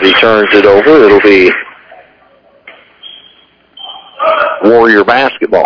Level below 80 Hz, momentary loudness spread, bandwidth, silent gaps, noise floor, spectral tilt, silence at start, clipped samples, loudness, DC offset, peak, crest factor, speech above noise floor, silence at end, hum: -44 dBFS; 22 LU; 5.4 kHz; none; -45 dBFS; -6 dB/octave; 0 s; 6%; -6 LUFS; under 0.1%; 0 dBFS; 8 dB; 40 dB; 0 s; none